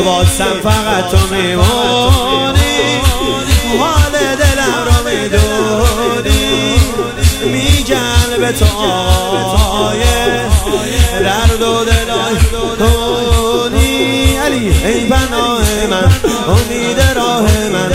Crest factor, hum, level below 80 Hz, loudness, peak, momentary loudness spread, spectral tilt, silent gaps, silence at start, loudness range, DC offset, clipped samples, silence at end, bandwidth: 10 dB; none; -18 dBFS; -12 LUFS; 0 dBFS; 2 LU; -4.5 dB/octave; none; 0 s; 1 LU; under 0.1%; under 0.1%; 0 s; 16.5 kHz